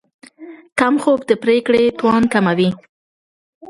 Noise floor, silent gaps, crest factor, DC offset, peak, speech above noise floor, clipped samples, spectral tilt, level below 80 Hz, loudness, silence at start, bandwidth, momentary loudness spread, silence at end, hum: -38 dBFS; 0.72-0.76 s; 16 dB; under 0.1%; 0 dBFS; 23 dB; under 0.1%; -6 dB/octave; -54 dBFS; -16 LUFS; 0.4 s; 11.5 kHz; 5 LU; 0.9 s; none